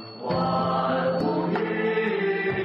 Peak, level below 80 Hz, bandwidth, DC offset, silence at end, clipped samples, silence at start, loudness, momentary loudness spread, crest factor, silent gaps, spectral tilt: -14 dBFS; -58 dBFS; 5.8 kHz; under 0.1%; 0 s; under 0.1%; 0 s; -25 LUFS; 2 LU; 10 dB; none; -8.5 dB/octave